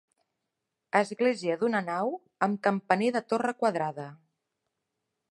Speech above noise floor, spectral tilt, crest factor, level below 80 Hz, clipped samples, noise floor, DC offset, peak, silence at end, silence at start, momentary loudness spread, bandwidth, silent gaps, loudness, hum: 56 dB; -6 dB/octave; 24 dB; -82 dBFS; under 0.1%; -84 dBFS; under 0.1%; -8 dBFS; 1.15 s; 0.95 s; 7 LU; 11.5 kHz; none; -28 LUFS; none